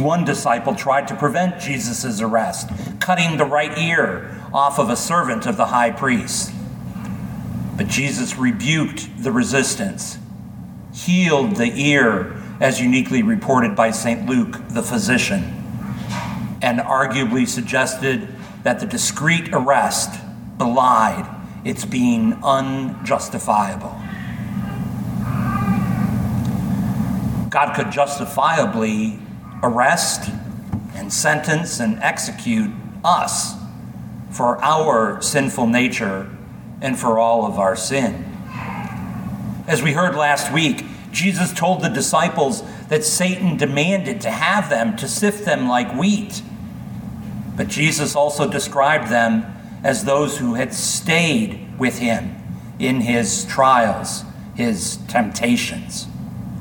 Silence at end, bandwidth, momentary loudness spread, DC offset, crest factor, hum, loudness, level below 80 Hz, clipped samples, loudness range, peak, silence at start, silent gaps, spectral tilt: 0 s; 19 kHz; 13 LU; under 0.1%; 18 dB; none; -19 LUFS; -46 dBFS; under 0.1%; 3 LU; -2 dBFS; 0 s; none; -4.5 dB/octave